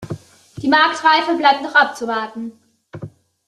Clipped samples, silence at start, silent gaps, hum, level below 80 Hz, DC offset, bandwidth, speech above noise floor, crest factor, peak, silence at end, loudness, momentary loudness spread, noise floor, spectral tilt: under 0.1%; 0 s; none; none; -60 dBFS; under 0.1%; 12.5 kHz; 21 dB; 18 dB; 0 dBFS; 0.4 s; -15 LUFS; 22 LU; -37 dBFS; -4 dB/octave